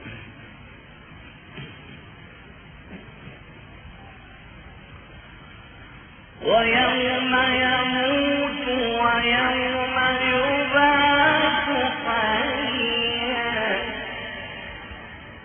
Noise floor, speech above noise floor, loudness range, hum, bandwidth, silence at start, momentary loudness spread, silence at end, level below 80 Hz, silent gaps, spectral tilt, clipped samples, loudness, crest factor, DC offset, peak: -45 dBFS; 24 dB; 23 LU; none; 4.9 kHz; 0 s; 24 LU; 0 s; -48 dBFS; none; -8.5 dB/octave; under 0.1%; -21 LUFS; 18 dB; under 0.1%; -6 dBFS